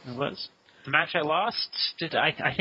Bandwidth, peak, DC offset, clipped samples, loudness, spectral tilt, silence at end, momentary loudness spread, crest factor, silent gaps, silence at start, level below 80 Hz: 7.6 kHz; -6 dBFS; under 0.1%; under 0.1%; -26 LUFS; -6 dB/octave; 0 s; 13 LU; 22 dB; none; 0.05 s; -64 dBFS